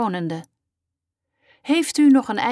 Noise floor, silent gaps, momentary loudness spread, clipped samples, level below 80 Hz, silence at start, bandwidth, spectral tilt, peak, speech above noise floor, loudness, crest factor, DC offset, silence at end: -84 dBFS; none; 17 LU; under 0.1%; -72 dBFS; 0 s; 11 kHz; -4.5 dB/octave; -8 dBFS; 65 dB; -19 LUFS; 14 dB; under 0.1%; 0 s